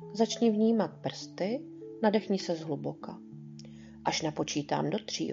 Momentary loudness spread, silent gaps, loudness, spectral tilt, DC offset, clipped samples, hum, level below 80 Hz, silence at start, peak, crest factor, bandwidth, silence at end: 19 LU; none; -31 LUFS; -5 dB/octave; under 0.1%; under 0.1%; none; -70 dBFS; 0 s; -12 dBFS; 20 dB; 7.8 kHz; 0 s